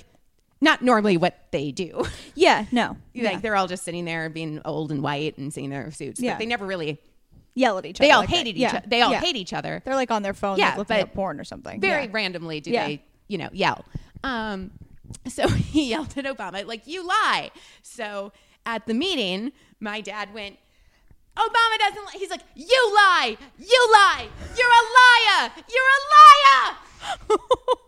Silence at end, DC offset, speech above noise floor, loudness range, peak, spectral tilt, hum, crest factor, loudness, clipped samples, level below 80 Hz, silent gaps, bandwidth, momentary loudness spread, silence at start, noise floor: 0.15 s; under 0.1%; 39 dB; 14 LU; 0 dBFS; -3.5 dB/octave; none; 20 dB; -19 LUFS; under 0.1%; -48 dBFS; none; 15 kHz; 19 LU; 0.6 s; -60 dBFS